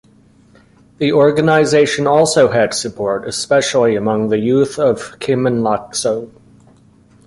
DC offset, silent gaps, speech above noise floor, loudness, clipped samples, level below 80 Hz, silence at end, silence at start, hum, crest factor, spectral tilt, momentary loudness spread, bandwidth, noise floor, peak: under 0.1%; none; 34 dB; -15 LUFS; under 0.1%; -52 dBFS; 1 s; 1 s; none; 14 dB; -4.5 dB/octave; 8 LU; 11.5 kHz; -48 dBFS; 0 dBFS